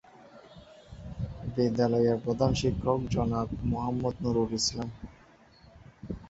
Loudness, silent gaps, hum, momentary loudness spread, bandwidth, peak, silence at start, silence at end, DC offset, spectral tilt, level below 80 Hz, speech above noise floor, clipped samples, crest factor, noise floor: -29 LUFS; none; none; 19 LU; 8 kHz; -12 dBFS; 0.2 s; 0.05 s; under 0.1%; -6 dB/octave; -46 dBFS; 29 dB; under 0.1%; 20 dB; -57 dBFS